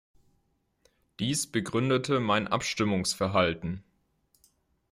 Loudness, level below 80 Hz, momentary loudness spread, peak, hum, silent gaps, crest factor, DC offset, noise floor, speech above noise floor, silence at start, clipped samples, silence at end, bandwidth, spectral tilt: -28 LUFS; -60 dBFS; 8 LU; -10 dBFS; none; none; 20 dB; under 0.1%; -73 dBFS; 46 dB; 1.2 s; under 0.1%; 1.1 s; 16 kHz; -4.5 dB/octave